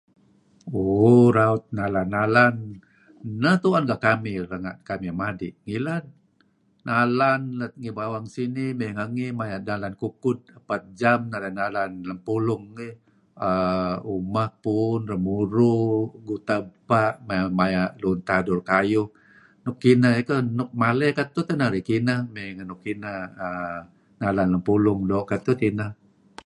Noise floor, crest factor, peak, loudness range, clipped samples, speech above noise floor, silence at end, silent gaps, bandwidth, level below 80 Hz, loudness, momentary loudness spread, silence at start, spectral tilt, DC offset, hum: -64 dBFS; 20 dB; -2 dBFS; 6 LU; under 0.1%; 41 dB; 0.5 s; none; 11 kHz; -54 dBFS; -24 LUFS; 13 LU; 0.65 s; -8 dB/octave; under 0.1%; none